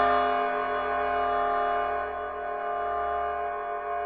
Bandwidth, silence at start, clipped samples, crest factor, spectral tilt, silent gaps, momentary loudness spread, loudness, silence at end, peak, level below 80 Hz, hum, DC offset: 5 kHz; 0 s; under 0.1%; 16 dB; -1.5 dB/octave; none; 7 LU; -28 LUFS; 0 s; -12 dBFS; -52 dBFS; none; under 0.1%